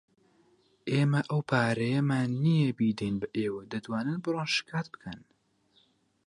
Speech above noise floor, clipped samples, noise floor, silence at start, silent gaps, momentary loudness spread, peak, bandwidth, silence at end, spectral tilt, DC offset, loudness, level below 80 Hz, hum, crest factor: 39 dB; under 0.1%; -68 dBFS; 0.85 s; none; 13 LU; -12 dBFS; 11 kHz; 1.1 s; -6.5 dB/octave; under 0.1%; -29 LUFS; -66 dBFS; none; 18 dB